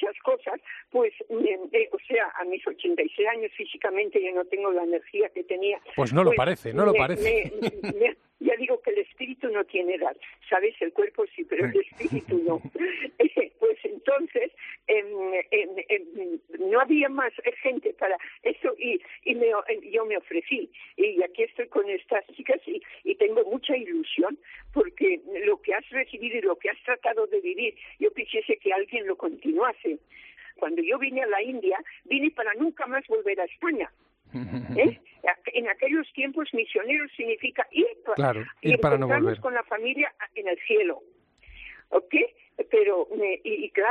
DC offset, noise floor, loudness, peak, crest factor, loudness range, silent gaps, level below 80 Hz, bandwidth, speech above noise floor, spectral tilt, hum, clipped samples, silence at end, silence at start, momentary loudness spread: under 0.1%; -49 dBFS; -26 LUFS; -8 dBFS; 20 dB; 3 LU; none; -60 dBFS; 8.8 kHz; 23 dB; -7 dB/octave; none; under 0.1%; 0 s; 0 s; 8 LU